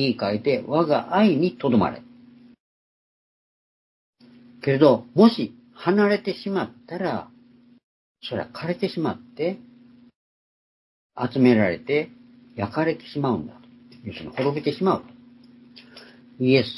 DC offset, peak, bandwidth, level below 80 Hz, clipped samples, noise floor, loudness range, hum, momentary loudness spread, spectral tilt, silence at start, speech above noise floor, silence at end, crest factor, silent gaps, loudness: under 0.1%; -2 dBFS; 11.5 kHz; -66 dBFS; under 0.1%; -54 dBFS; 9 LU; none; 15 LU; -8.5 dB/octave; 0 s; 32 dB; 0 s; 22 dB; 2.60-4.13 s, 7.84-8.15 s, 10.15-11.10 s; -23 LUFS